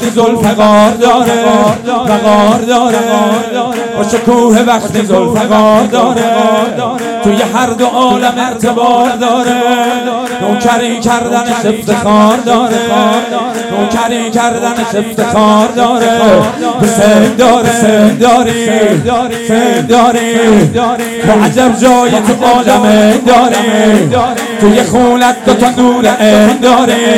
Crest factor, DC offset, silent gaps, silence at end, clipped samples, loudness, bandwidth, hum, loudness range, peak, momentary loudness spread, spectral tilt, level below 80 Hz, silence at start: 8 dB; under 0.1%; none; 0 s; 4%; -8 LUFS; 16.5 kHz; none; 3 LU; 0 dBFS; 6 LU; -4.5 dB/octave; -42 dBFS; 0 s